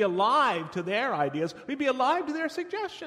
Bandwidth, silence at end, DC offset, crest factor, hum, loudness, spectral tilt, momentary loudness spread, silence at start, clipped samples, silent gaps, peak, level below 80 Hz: 13.5 kHz; 0 s; under 0.1%; 16 dB; none; -27 LUFS; -5 dB/octave; 10 LU; 0 s; under 0.1%; none; -12 dBFS; -72 dBFS